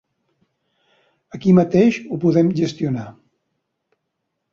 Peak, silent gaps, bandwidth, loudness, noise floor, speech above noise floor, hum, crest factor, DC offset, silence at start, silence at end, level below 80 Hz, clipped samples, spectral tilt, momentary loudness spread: -2 dBFS; none; 7.2 kHz; -18 LUFS; -76 dBFS; 59 dB; none; 18 dB; under 0.1%; 1.35 s; 1.4 s; -58 dBFS; under 0.1%; -8 dB/octave; 14 LU